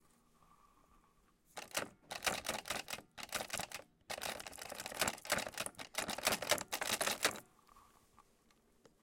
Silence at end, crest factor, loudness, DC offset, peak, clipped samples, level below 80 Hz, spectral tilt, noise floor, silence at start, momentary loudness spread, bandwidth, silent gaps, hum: 1.2 s; 26 dB; -39 LUFS; under 0.1%; -16 dBFS; under 0.1%; -70 dBFS; -1 dB/octave; -72 dBFS; 1.55 s; 11 LU; 17 kHz; none; none